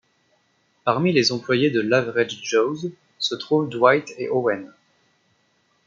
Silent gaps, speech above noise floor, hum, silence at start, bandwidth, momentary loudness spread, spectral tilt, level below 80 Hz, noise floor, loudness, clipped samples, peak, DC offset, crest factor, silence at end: none; 44 dB; none; 0.85 s; 7.6 kHz; 9 LU; -5 dB/octave; -70 dBFS; -65 dBFS; -21 LUFS; under 0.1%; -2 dBFS; under 0.1%; 20 dB; 1.2 s